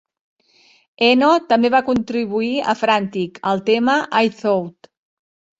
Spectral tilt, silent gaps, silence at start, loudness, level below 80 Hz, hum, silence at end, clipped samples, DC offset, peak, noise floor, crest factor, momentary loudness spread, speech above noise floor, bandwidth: -5.5 dB/octave; none; 1 s; -17 LUFS; -58 dBFS; none; 0.9 s; under 0.1%; under 0.1%; -2 dBFS; -55 dBFS; 16 dB; 7 LU; 38 dB; 8 kHz